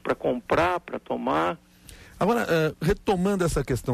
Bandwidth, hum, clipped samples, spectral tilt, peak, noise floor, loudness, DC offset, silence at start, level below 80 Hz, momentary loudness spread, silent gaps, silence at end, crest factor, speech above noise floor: 15 kHz; none; under 0.1%; -6 dB/octave; -12 dBFS; -48 dBFS; -25 LUFS; under 0.1%; 0.05 s; -42 dBFS; 7 LU; none; 0 s; 14 dB; 24 dB